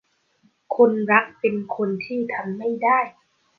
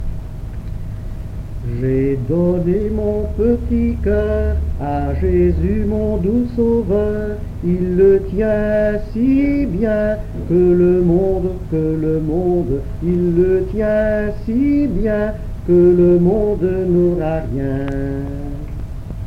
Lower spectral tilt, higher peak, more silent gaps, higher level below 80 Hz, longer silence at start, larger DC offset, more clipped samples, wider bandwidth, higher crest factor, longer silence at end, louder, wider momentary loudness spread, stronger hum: second, -8.5 dB/octave vs -10 dB/octave; about the same, -2 dBFS vs -2 dBFS; neither; second, -72 dBFS vs -26 dBFS; first, 0.7 s vs 0 s; neither; neither; second, 4.9 kHz vs 6.2 kHz; first, 20 dB vs 14 dB; first, 0.5 s vs 0 s; second, -22 LUFS vs -17 LUFS; second, 9 LU vs 14 LU; neither